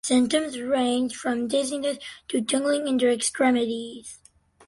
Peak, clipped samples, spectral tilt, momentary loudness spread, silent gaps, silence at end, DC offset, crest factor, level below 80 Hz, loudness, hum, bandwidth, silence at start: -8 dBFS; under 0.1%; -2.5 dB/octave; 11 LU; none; 0.5 s; under 0.1%; 16 dB; -64 dBFS; -24 LUFS; none; 11.5 kHz; 0.05 s